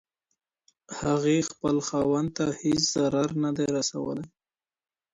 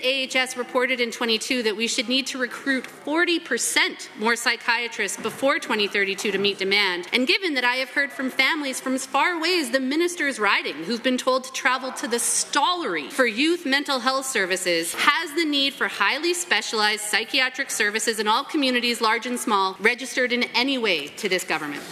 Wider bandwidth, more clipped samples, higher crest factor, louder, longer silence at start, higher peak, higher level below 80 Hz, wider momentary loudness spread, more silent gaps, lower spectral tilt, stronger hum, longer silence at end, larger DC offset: second, 9.6 kHz vs 14.5 kHz; neither; about the same, 18 dB vs 22 dB; second, -26 LUFS vs -22 LUFS; first, 0.9 s vs 0 s; second, -10 dBFS vs -2 dBFS; first, -58 dBFS vs -76 dBFS; first, 9 LU vs 5 LU; neither; first, -4.5 dB/octave vs -1.5 dB/octave; neither; first, 0.85 s vs 0 s; neither